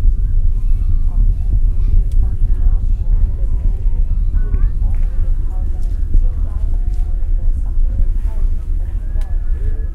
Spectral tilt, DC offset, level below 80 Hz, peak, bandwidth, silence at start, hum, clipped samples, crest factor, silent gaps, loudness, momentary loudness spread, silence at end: -9 dB/octave; under 0.1%; -14 dBFS; 0 dBFS; 1.8 kHz; 0 s; none; under 0.1%; 12 dB; none; -21 LUFS; 5 LU; 0 s